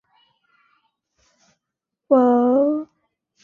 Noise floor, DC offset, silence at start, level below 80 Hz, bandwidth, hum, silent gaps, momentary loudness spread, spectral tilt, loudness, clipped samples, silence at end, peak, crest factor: -83 dBFS; under 0.1%; 2.1 s; -72 dBFS; 3.3 kHz; none; none; 12 LU; -8.5 dB/octave; -18 LUFS; under 0.1%; 0.6 s; -4 dBFS; 20 dB